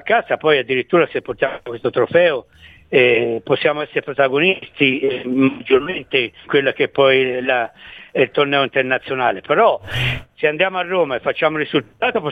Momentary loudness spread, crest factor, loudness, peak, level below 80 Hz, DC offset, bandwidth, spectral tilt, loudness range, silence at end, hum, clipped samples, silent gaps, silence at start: 7 LU; 16 dB; -17 LUFS; 0 dBFS; -48 dBFS; under 0.1%; 8.2 kHz; -6.5 dB/octave; 1 LU; 0 s; none; under 0.1%; none; 0.05 s